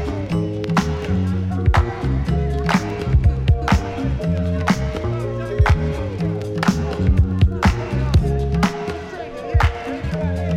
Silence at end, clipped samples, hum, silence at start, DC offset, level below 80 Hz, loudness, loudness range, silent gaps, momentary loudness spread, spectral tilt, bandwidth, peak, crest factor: 0 s; under 0.1%; none; 0 s; under 0.1%; -24 dBFS; -20 LUFS; 1 LU; none; 6 LU; -7 dB/octave; 12.5 kHz; -2 dBFS; 16 dB